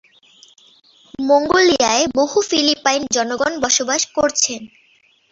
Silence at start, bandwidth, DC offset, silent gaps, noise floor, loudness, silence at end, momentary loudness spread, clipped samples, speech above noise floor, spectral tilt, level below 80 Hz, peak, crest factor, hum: 1.2 s; 8 kHz; under 0.1%; none; -56 dBFS; -16 LUFS; 0.65 s; 6 LU; under 0.1%; 39 dB; -1 dB/octave; -54 dBFS; 0 dBFS; 18 dB; none